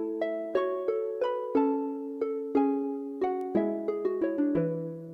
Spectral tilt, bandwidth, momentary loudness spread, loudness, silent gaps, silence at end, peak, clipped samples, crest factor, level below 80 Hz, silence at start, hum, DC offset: -9 dB/octave; 5.4 kHz; 6 LU; -30 LUFS; none; 0 s; -14 dBFS; under 0.1%; 16 dB; -68 dBFS; 0 s; none; under 0.1%